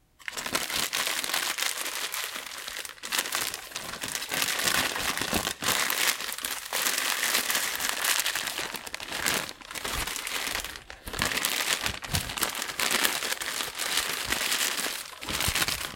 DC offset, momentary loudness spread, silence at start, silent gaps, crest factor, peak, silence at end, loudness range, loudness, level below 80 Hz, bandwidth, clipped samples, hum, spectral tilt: under 0.1%; 10 LU; 0.2 s; none; 30 dB; -2 dBFS; 0 s; 4 LU; -28 LUFS; -52 dBFS; 17 kHz; under 0.1%; none; -0.5 dB/octave